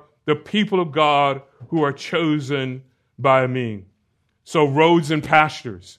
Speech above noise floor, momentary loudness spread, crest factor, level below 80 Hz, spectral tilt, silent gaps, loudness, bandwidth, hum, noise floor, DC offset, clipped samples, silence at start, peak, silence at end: 49 dB; 14 LU; 20 dB; -62 dBFS; -6 dB/octave; none; -19 LUFS; 13 kHz; none; -68 dBFS; under 0.1%; under 0.1%; 0.25 s; 0 dBFS; 0.05 s